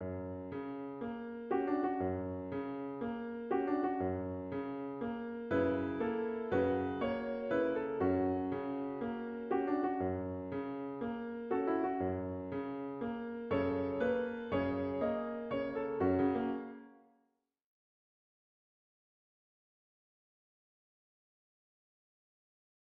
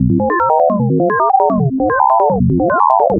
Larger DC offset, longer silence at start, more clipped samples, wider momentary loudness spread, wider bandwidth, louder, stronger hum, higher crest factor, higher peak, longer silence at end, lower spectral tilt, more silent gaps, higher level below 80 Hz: neither; about the same, 0 s vs 0 s; neither; first, 9 LU vs 2 LU; first, 5.2 kHz vs 2.9 kHz; second, -37 LUFS vs -13 LUFS; neither; about the same, 16 dB vs 12 dB; second, -22 dBFS vs 0 dBFS; first, 6.05 s vs 0 s; second, -6.5 dB/octave vs -12.5 dB/octave; neither; second, -68 dBFS vs -34 dBFS